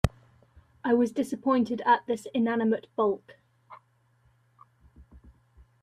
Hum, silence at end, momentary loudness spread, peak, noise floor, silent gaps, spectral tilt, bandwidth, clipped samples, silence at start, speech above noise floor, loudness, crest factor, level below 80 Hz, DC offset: none; 0.65 s; 6 LU; -4 dBFS; -66 dBFS; none; -7 dB/octave; 13.5 kHz; under 0.1%; 0.05 s; 40 dB; -27 LUFS; 26 dB; -48 dBFS; under 0.1%